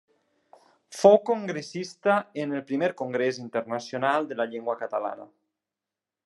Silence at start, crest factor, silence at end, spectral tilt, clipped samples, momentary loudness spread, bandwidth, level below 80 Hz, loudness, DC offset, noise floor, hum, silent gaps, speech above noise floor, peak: 0.9 s; 24 dB; 1 s; -5.5 dB/octave; under 0.1%; 14 LU; 12 kHz; -84 dBFS; -26 LUFS; under 0.1%; -89 dBFS; none; none; 63 dB; -4 dBFS